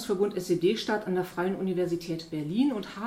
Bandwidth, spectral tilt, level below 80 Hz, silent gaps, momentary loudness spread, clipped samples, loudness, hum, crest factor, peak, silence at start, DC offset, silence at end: 16 kHz; -6 dB/octave; -62 dBFS; none; 6 LU; under 0.1%; -29 LUFS; none; 14 dB; -14 dBFS; 0 s; under 0.1%; 0 s